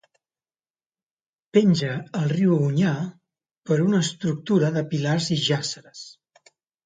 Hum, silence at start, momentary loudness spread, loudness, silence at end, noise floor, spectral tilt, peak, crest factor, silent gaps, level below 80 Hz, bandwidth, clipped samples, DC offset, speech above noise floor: none; 1.55 s; 15 LU; -23 LUFS; 0.75 s; under -90 dBFS; -6 dB/octave; -4 dBFS; 20 dB; 3.51-3.55 s; -66 dBFS; 9.4 kHz; under 0.1%; under 0.1%; over 68 dB